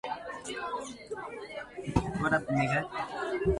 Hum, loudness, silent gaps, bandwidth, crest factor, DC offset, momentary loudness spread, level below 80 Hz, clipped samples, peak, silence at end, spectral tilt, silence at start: none; -33 LUFS; none; 11.5 kHz; 22 dB; under 0.1%; 12 LU; -48 dBFS; under 0.1%; -10 dBFS; 0 s; -6 dB/octave; 0.05 s